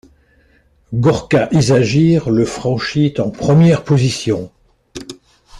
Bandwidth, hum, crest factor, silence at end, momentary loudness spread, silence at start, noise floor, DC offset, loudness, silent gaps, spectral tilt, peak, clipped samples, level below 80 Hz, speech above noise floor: 11 kHz; none; 14 dB; 0 s; 20 LU; 0.9 s; -53 dBFS; under 0.1%; -14 LUFS; none; -6.5 dB/octave; -2 dBFS; under 0.1%; -44 dBFS; 40 dB